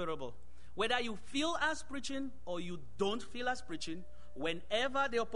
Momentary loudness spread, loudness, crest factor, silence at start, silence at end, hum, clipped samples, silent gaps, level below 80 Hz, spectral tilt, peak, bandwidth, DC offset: 11 LU; -37 LUFS; 20 dB; 0 s; 0 s; none; under 0.1%; none; -58 dBFS; -3.5 dB/octave; -18 dBFS; 10.5 kHz; 1%